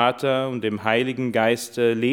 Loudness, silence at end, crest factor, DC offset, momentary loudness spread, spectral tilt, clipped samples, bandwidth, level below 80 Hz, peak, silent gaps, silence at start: -22 LUFS; 0 s; 18 dB; under 0.1%; 3 LU; -5 dB/octave; under 0.1%; 17.5 kHz; -72 dBFS; -2 dBFS; none; 0 s